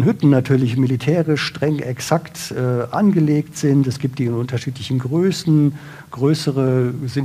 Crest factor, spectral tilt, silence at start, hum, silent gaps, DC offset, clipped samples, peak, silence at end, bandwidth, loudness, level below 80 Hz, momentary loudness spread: 14 dB; -7 dB/octave; 0 s; none; none; under 0.1%; under 0.1%; -2 dBFS; 0 s; 15 kHz; -18 LUFS; -56 dBFS; 7 LU